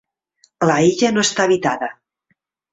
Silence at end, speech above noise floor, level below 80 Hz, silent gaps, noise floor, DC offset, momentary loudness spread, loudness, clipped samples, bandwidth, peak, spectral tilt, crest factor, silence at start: 0.8 s; 52 dB; -58 dBFS; none; -68 dBFS; under 0.1%; 9 LU; -17 LUFS; under 0.1%; 8.4 kHz; -2 dBFS; -4 dB/octave; 18 dB; 0.6 s